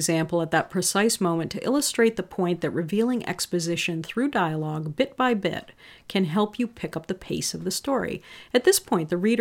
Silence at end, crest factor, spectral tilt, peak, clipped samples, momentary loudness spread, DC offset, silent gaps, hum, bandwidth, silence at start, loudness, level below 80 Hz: 0 s; 18 dB; -4 dB/octave; -6 dBFS; under 0.1%; 8 LU; under 0.1%; none; none; 17.5 kHz; 0 s; -25 LUFS; -58 dBFS